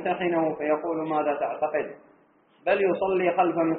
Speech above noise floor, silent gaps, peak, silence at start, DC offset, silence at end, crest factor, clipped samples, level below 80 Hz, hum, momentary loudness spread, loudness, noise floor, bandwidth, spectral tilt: 35 dB; none; -10 dBFS; 0 s; under 0.1%; 0 s; 16 dB; under 0.1%; -68 dBFS; none; 5 LU; -26 LUFS; -60 dBFS; 4 kHz; -4.5 dB/octave